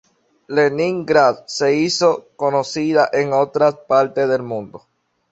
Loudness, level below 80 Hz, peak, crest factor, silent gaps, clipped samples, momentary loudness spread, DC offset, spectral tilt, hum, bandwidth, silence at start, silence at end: -17 LUFS; -62 dBFS; 0 dBFS; 18 dB; none; under 0.1%; 7 LU; under 0.1%; -4.5 dB/octave; none; 8.2 kHz; 0.5 s; 0.55 s